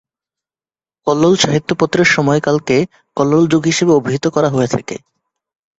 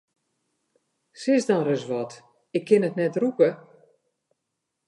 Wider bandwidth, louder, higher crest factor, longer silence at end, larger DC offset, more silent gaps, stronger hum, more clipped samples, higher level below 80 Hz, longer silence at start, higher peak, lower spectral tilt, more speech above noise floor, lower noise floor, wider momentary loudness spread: second, 8 kHz vs 11 kHz; first, -14 LUFS vs -24 LUFS; about the same, 16 dB vs 20 dB; second, 0.8 s vs 1.3 s; neither; neither; neither; neither; first, -52 dBFS vs -80 dBFS; second, 1.05 s vs 1.2 s; first, 0 dBFS vs -6 dBFS; second, -5 dB/octave vs -6.5 dB/octave; first, over 76 dB vs 58 dB; first, under -90 dBFS vs -81 dBFS; about the same, 10 LU vs 10 LU